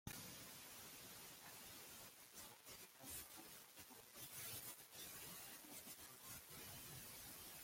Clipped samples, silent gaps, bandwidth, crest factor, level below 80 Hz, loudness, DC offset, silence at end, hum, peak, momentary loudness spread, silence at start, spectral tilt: under 0.1%; none; 16.5 kHz; 22 dB; -78 dBFS; -55 LUFS; under 0.1%; 0 s; none; -36 dBFS; 6 LU; 0.05 s; -1.5 dB/octave